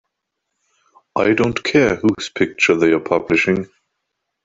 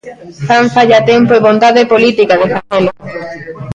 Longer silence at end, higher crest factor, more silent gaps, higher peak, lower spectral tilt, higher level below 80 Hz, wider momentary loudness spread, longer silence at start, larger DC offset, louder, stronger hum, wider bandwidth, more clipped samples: first, 0.8 s vs 0 s; first, 16 dB vs 10 dB; neither; about the same, -2 dBFS vs 0 dBFS; about the same, -5.5 dB/octave vs -5.5 dB/octave; about the same, -50 dBFS vs -48 dBFS; second, 7 LU vs 17 LU; first, 1.15 s vs 0.05 s; neither; second, -17 LUFS vs -9 LUFS; neither; about the same, 7.8 kHz vs 8.2 kHz; neither